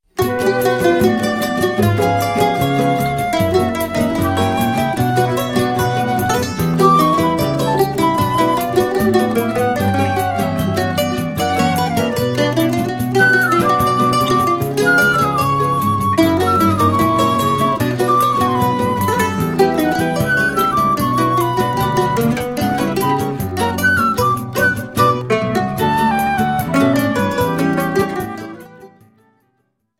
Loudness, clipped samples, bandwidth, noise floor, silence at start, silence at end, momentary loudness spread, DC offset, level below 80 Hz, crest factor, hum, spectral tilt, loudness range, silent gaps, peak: -16 LUFS; under 0.1%; 16.5 kHz; -66 dBFS; 0.15 s; 1.15 s; 4 LU; under 0.1%; -42 dBFS; 16 dB; none; -5.5 dB/octave; 3 LU; none; 0 dBFS